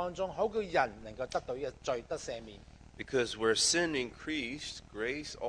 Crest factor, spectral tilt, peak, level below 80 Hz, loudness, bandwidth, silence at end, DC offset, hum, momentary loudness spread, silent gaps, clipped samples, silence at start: 20 dB; -2.5 dB/octave; -14 dBFS; -58 dBFS; -34 LUFS; 10.5 kHz; 0 s; under 0.1%; none; 15 LU; none; under 0.1%; 0 s